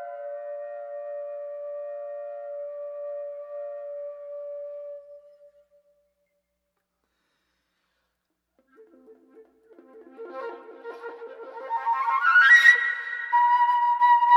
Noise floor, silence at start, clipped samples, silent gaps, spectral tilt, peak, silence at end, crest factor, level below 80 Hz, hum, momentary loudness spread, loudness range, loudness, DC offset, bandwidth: -79 dBFS; 0 s; under 0.1%; none; 1 dB/octave; -4 dBFS; 0 s; 22 dB; -82 dBFS; none; 23 LU; 24 LU; -19 LUFS; under 0.1%; 13 kHz